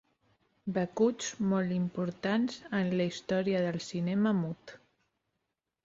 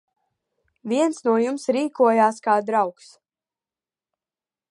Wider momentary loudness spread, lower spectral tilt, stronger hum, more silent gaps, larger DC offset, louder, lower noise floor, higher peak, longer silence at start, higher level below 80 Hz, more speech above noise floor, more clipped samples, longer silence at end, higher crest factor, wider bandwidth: second, 5 LU vs 8 LU; about the same, -6 dB/octave vs -5 dB/octave; neither; neither; neither; second, -32 LUFS vs -21 LUFS; second, -85 dBFS vs under -90 dBFS; second, -16 dBFS vs -4 dBFS; second, 0.65 s vs 0.85 s; first, -70 dBFS vs -78 dBFS; second, 54 dB vs over 69 dB; neither; second, 1.1 s vs 1.8 s; about the same, 16 dB vs 20 dB; second, 7.8 kHz vs 11.5 kHz